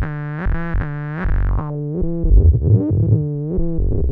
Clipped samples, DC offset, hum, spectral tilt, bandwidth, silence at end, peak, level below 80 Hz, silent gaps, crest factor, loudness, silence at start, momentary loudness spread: under 0.1%; under 0.1%; none; -12.5 dB/octave; 3.3 kHz; 0 s; -2 dBFS; -20 dBFS; none; 14 dB; -19 LUFS; 0 s; 10 LU